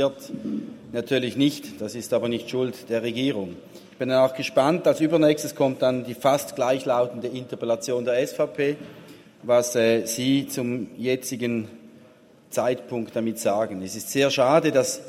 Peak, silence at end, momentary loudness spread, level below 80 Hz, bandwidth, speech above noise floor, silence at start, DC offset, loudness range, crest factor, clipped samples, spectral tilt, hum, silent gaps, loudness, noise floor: -4 dBFS; 0 s; 12 LU; -68 dBFS; 16 kHz; 29 dB; 0 s; under 0.1%; 5 LU; 20 dB; under 0.1%; -4.5 dB/octave; none; none; -24 LUFS; -52 dBFS